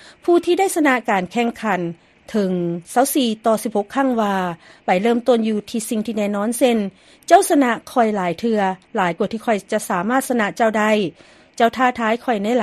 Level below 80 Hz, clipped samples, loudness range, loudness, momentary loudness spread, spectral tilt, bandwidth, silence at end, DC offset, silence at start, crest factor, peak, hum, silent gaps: -60 dBFS; under 0.1%; 2 LU; -19 LUFS; 7 LU; -4.5 dB/octave; 13.5 kHz; 0 s; under 0.1%; 0.25 s; 18 dB; 0 dBFS; none; none